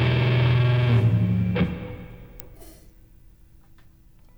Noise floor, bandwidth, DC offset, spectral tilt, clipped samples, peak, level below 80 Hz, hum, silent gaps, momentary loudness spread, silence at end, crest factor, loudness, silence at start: -51 dBFS; over 20 kHz; under 0.1%; -8.5 dB/octave; under 0.1%; -8 dBFS; -42 dBFS; none; none; 23 LU; 1.7 s; 14 dB; -21 LUFS; 0 s